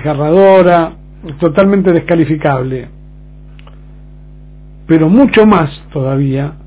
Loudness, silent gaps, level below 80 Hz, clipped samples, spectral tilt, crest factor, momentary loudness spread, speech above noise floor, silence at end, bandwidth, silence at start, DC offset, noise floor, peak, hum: -10 LUFS; none; -36 dBFS; 1%; -11.5 dB/octave; 12 dB; 13 LU; 24 dB; 0 s; 4 kHz; 0 s; under 0.1%; -34 dBFS; 0 dBFS; 50 Hz at -35 dBFS